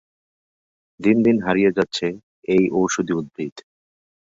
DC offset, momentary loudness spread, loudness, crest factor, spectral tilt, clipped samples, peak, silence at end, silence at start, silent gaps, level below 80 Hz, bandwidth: under 0.1%; 14 LU; -20 LUFS; 18 dB; -5.5 dB/octave; under 0.1%; -2 dBFS; 0.7 s; 1 s; 2.23-2.42 s, 3.52-3.56 s; -58 dBFS; 7.8 kHz